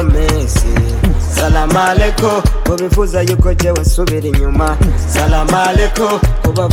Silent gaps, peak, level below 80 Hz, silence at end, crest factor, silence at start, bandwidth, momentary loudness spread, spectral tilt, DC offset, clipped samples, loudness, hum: none; 0 dBFS; -14 dBFS; 0 s; 10 dB; 0 s; 16.5 kHz; 3 LU; -5.5 dB/octave; under 0.1%; under 0.1%; -13 LUFS; none